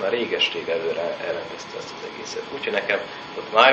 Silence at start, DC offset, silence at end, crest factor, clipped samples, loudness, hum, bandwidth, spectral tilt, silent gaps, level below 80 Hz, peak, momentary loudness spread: 0 s; under 0.1%; 0 s; 24 dB; under 0.1%; -25 LUFS; none; 8.2 kHz; -2.5 dB/octave; none; -68 dBFS; 0 dBFS; 12 LU